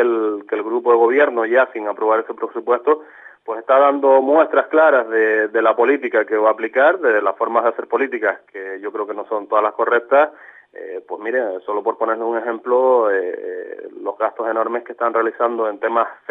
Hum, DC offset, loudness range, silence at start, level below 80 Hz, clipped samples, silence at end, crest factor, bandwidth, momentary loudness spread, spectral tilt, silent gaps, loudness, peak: none; under 0.1%; 5 LU; 0 s; -86 dBFS; under 0.1%; 0.15 s; 16 dB; 3.9 kHz; 14 LU; -6 dB/octave; none; -17 LUFS; -2 dBFS